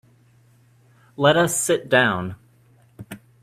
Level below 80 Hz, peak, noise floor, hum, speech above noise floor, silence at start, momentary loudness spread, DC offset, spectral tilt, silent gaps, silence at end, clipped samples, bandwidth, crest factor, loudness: -60 dBFS; -2 dBFS; -56 dBFS; none; 37 dB; 1.2 s; 23 LU; under 0.1%; -3.5 dB/octave; none; 0.25 s; under 0.1%; 15.5 kHz; 22 dB; -19 LUFS